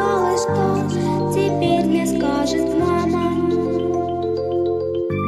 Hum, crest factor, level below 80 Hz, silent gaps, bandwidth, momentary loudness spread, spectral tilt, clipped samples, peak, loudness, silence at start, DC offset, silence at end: none; 12 dB; -44 dBFS; none; 14 kHz; 4 LU; -6.5 dB/octave; under 0.1%; -6 dBFS; -19 LUFS; 0 s; under 0.1%; 0 s